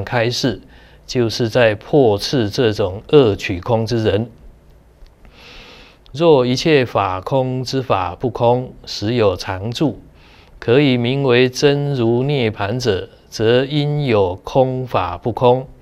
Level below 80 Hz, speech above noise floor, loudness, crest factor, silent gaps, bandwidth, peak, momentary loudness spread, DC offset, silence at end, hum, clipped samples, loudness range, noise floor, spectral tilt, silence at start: -46 dBFS; 30 dB; -17 LUFS; 16 dB; none; 15 kHz; 0 dBFS; 9 LU; under 0.1%; 0.1 s; none; under 0.1%; 3 LU; -47 dBFS; -6 dB/octave; 0 s